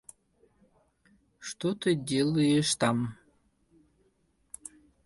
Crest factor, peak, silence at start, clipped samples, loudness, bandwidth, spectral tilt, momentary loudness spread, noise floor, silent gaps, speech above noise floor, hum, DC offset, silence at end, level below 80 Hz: 20 dB; -12 dBFS; 1.4 s; under 0.1%; -28 LUFS; 11.5 kHz; -5 dB/octave; 20 LU; -71 dBFS; none; 43 dB; none; under 0.1%; 1.9 s; -64 dBFS